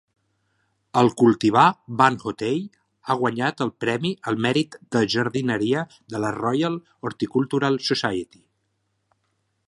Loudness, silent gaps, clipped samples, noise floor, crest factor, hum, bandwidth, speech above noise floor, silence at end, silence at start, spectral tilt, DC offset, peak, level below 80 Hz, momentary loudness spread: -22 LUFS; none; under 0.1%; -73 dBFS; 20 dB; none; 11.5 kHz; 51 dB; 1.45 s; 0.95 s; -5.5 dB/octave; under 0.1%; -2 dBFS; -62 dBFS; 11 LU